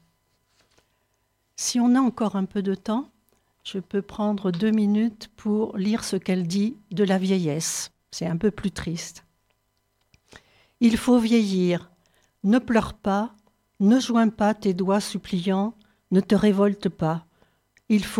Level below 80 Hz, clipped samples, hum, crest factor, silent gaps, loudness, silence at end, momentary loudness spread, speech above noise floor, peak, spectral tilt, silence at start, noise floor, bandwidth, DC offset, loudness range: -54 dBFS; under 0.1%; none; 16 dB; none; -24 LUFS; 0 s; 11 LU; 49 dB; -8 dBFS; -5.5 dB/octave; 1.6 s; -71 dBFS; 14.5 kHz; under 0.1%; 4 LU